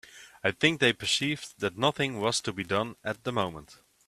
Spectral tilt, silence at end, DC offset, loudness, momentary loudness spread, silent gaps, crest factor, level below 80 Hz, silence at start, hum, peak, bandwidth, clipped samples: -3.5 dB/octave; 0.35 s; under 0.1%; -28 LUFS; 10 LU; none; 24 dB; -64 dBFS; 0.15 s; none; -6 dBFS; 14.5 kHz; under 0.1%